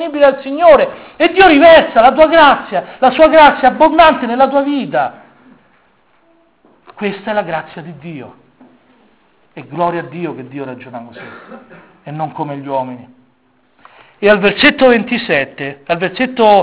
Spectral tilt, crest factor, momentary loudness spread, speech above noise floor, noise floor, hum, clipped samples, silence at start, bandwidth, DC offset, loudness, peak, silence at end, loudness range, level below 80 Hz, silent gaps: -8.5 dB/octave; 12 dB; 22 LU; 44 dB; -56 dBFS; none; 1%; 0 s; 4 kHz; under 0.1%; -11 LUFS; 0 dBFS; 0 s; 16 LU; -46 dBFS; none